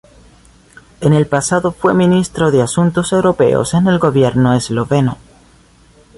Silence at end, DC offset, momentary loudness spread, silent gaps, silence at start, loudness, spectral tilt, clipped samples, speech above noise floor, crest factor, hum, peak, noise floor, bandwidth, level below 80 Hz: 1 s; under 0.1%; 4 LU; none; 1 s; -13 LUFS; -6 dB/octave; under 0.1%; 34 dB; 12 dB; none; -2 dBFS; -47 dBFS; 11.5 kHz; -42 dBFS